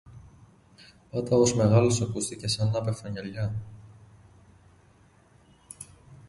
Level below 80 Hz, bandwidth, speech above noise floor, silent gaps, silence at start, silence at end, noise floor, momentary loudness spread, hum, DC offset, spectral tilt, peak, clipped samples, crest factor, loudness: -54 dBFS; 11.5 kHz; 34 dB; none; 0.05 s; 0.1 s; -59 dBFS; 23 LU; none; under 0.1%; -5.5 dB/octave; -10 dBFS; under 0.1%; 20 dB; -26 LUFS